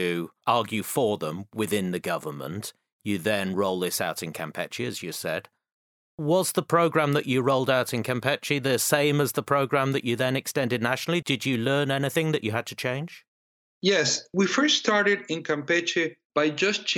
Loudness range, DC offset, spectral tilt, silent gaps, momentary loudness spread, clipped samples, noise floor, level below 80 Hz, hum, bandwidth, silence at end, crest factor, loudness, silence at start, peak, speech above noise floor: 5 LU; under 0.1%; -4 dB/octave; 2.92-3.00 s, 5.73-6.18 s, 13.28-13.81 s, 16.25-16.30 s; 10 LU; under 0.1%; under -90 dBFS; -72 dBFS; none; 17 kHz; 0 s; 20 dB; -25 LUFS; 0 s; -6 dBFS; over 64 dB